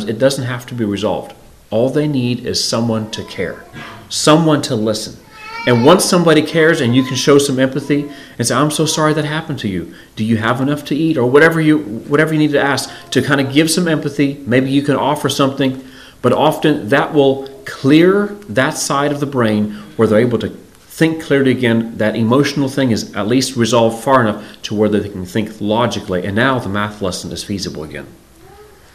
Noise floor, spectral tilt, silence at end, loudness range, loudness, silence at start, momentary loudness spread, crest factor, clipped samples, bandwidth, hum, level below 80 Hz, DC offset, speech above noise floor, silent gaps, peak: -41 dBFS; -5 dB/octave; 0.8 s; 5 LU; -15 LUFS; 0 s; 12 LU; 14 dB; 0.1%; 15.5 kHz; none; -50 dBFS; 0.2%; 27 dB; none; 0 dBFS